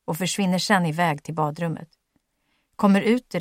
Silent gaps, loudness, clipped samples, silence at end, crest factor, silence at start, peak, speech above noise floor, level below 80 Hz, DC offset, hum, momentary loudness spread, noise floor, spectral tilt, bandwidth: none; -23 LUFS; under 0.1%; 0 s; 18 dB; 0.1 s; -4 dBFS; 49 dB; -66 dBFS; under 0.1%; none; 9 LU; -71 dBFS; -5 dB/octave; 16.5 kHz